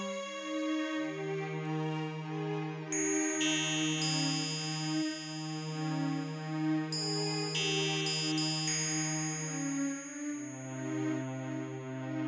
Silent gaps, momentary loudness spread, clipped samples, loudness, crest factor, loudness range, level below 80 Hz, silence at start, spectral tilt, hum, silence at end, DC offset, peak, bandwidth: none; 9 LU; under 0.1%; -34 LUFS; 14 dB; 3 LU; -86 dBFS; 0 s; -3.5 dB/octave; none; 0 s; under 0.1%; -20 dBFS; 8 kHz